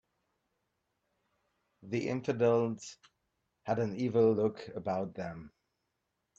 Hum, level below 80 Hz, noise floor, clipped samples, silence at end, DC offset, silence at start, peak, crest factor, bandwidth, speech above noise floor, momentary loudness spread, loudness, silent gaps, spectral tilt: none; -72 dBFS; -84 dBFS; under 0.1%; 0.9 s; under 0.1%; 1.85 s; -16 dBFS; 20 dB; 7.8 kHz; 52 dB; 16 LU; -32 LUFS; none; -7 dB/octave